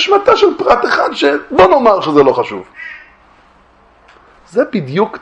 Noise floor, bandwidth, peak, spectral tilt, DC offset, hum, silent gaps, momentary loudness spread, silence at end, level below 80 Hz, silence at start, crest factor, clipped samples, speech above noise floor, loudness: -47 dBFS; 8.6 kHz; 0 dBFS; -5.5 dB/octave; under 0.1%; none; none; 15 LU; 0.05 s; -46 dBFS; 0 s; 12 dB; 0.2%; 36 dB; -11 LUFS